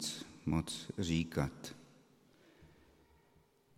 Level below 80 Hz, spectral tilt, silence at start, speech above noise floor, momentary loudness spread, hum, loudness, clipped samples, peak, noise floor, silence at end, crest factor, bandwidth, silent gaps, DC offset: -60 dBFS; -5 dB/octave; 0 s; 33 dB; 15 LU; none; -39 LUFS; under 0.1%; -18 dBFS; -70 dBFS; 1.1 s; 24 dB; 15.5 kHz; none; under 0.1%